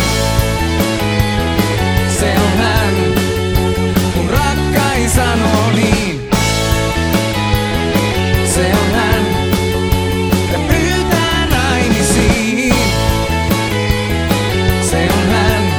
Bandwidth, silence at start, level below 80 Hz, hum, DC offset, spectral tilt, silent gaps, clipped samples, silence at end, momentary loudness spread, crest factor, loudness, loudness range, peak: over 20 kHz; 0 s; -22 dBFS; none; under 0.1%; -5 dB/octave; none; under 0.1%; 0 s; 2 LU; 14 dB; -14 LUFS; 1 LU; 0 dBFS